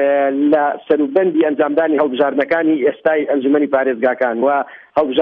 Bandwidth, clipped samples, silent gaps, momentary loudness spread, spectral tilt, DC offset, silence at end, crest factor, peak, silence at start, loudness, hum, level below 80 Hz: 4.7 kHz; under 0.1%; none; 3 LU; -8 dB/octave; under 0.1%; 0 s; 12 dB; -2 dBFS; 0 s; -16 LUFS; none; -62 dBFS